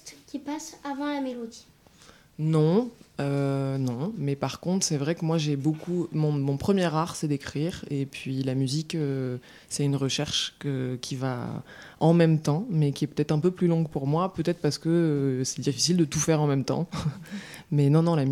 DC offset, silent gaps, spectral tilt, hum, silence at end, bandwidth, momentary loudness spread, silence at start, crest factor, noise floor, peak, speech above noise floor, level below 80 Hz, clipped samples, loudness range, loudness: under 0.1%; none; -5.5 dB/octave; none; 0 s; 15 kHz; 12 LU; 0.05 s; 18 dB; -54 dBFS; -8 dBFS; 28 dB; -58 dBFS; under 0.1%; 4 LU; -27 LUFS